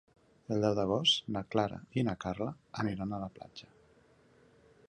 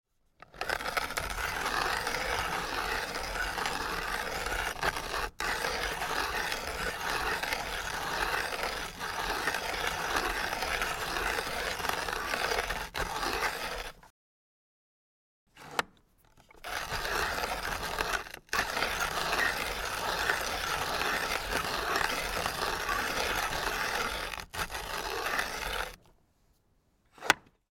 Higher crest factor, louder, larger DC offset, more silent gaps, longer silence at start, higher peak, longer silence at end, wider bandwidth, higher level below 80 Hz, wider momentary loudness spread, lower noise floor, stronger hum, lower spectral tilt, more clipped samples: second, 22 dB vs 32 dB; about the same, -33 LUFS vs -32 LUFS; neither; second, none vs 14.10-15.47 s; about the same, 0.5 s vs 0.55 s; second, -14 dBFS vs -2 dBFS; first, 1.25 s vs 0.3 s; second, 11 kHz vs 17 kHz; second, -62 dBFS vs -48 dBFS; first, 15 LU vs 6 LU; second, -64 dBFS vs -70 dBFS; neither; first, -5 dB/octave vs -2 dB/octave; neither